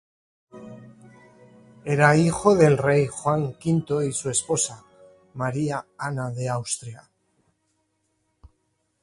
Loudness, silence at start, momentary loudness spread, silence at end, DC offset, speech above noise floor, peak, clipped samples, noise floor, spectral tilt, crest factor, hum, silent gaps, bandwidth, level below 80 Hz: -23 LUFS; 0.55 s; 18 LU; 2.05 s; under 0.1%; 50 dB; -2 dBFS; under 0.1%; -72 dBFS; -5.5 dB/octave; 22 dB; none; none; 11.5 kHz; -56 dBFS